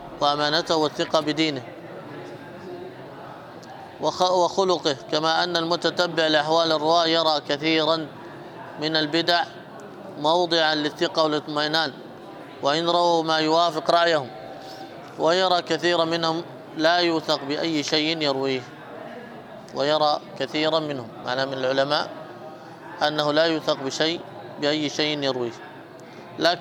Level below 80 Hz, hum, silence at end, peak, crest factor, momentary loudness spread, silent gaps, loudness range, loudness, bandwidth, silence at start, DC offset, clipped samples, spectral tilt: -70 dBFS; none; 0 s; -6 dBFS; 18 dB; 20 LU; none; 5 LU; -22 LUFS; 16 kHz; 0 s; under 0.1%; under 0.1%; -4 dB/octave